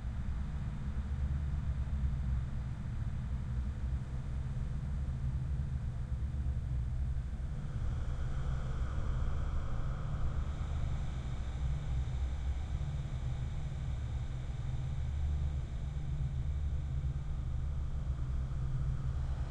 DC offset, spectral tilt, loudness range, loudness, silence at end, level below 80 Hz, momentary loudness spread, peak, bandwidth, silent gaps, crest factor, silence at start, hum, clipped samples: under 0.1%; -7.5 dB/octave; 1 LU; -39 LUFS; 0 s; -38 dBFS; 3 LU; -22 dBFS; 8.6 kHz; none; 12 dB; 0 s; none; under 0.1%